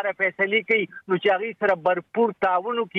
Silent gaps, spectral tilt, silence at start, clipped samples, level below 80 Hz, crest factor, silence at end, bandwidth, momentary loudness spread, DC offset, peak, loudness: none; -7 dB/octave; 0 s; under 0.1%; -70 dBFS; 14 dB; 0 s; 5.8 kHz; 3 LU; under 0.1%; -8 dBFS; -23 LUFS